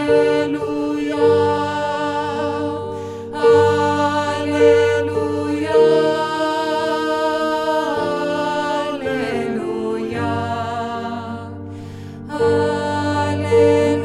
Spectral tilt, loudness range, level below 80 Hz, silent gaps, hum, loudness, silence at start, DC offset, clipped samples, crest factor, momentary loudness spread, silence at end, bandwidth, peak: -6 dB/octave; 6 LU; -54 dBFS; none; none; -18 LUFS; 0 s; under 0.1%; under 0.1%; 16 dB; 13 LU; 0 s; 11.5 kHz; -2 dBFS